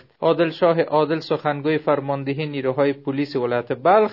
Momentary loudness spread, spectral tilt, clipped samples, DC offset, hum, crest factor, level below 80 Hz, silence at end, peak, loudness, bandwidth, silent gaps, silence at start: 7 LU; -8.5 dB/octave; under 0.1%; under 0.1%; none; 16 dB; -70 dBFS; 0 s; -4 dBFS; -21 LUFS; 6 kHz; none; 0.2 s